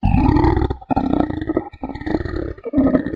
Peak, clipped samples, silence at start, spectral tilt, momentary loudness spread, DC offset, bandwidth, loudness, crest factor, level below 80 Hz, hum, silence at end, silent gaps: 0 dBFS; under 0.1%; 0 s; -10 dB/octave; 11 LU; under 0.1%; 5.4 kHz; -20 LUFS; 18 dB; -26 dBFS; none; 0 s; none